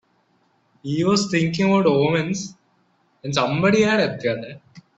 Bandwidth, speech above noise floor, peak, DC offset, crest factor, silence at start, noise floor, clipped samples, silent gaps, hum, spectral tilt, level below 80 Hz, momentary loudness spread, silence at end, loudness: 8.4 kHz; 44 dB; -4 dBFS; under 0.1%; 16 dB; 0.85 s; -63 dBFS; under 0.1%; none; none; -5.5 dB/octave; -58 dBFS; 16 LU; 0.15 s; -20 LUFS